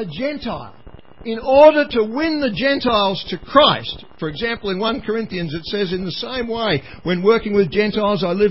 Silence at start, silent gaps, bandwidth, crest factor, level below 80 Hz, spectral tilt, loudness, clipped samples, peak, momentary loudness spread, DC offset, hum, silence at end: 0 s; none; 5.8 kHz; 18 dB; -44 dBFS; -8.5 dB/octave; -18 LUFS; under 0.1%; 0 dBFS; 13 LU; 0.8%; none; 0 s